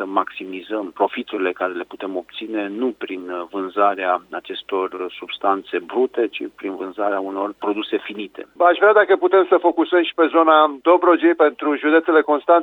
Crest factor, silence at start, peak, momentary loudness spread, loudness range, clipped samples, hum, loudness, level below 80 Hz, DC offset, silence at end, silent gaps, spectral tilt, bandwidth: 18 dB; 0 s; -2 dBFS; 14 LU; 9 LU; under 0.1%; none; -19 LUFS; -70 dBFS; under 0.1%; 0 s; none; -6 dB/octave; 4.2 kHz